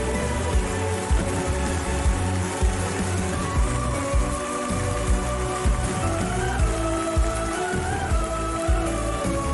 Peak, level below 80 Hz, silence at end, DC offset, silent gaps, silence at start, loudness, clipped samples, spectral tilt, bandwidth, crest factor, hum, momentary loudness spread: -10 dBFS; -28 dBFS; 0 s; under 0.1%; none; 0 s; -25 LUFS; under 0.1%; -5 dB/octave; 11.5 kHz; 14 dB; none; 2 LU